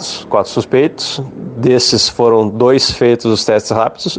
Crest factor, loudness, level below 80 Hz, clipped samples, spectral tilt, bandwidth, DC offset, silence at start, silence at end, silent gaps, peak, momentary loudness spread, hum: 12 dB; -12 LUFS; -44 dBFS; under 0.1%; -4.5 dB/octave; 9.6 kHz; under 0.1%; 0 s; 0 s; none; 0 dBFS; 7 LU; none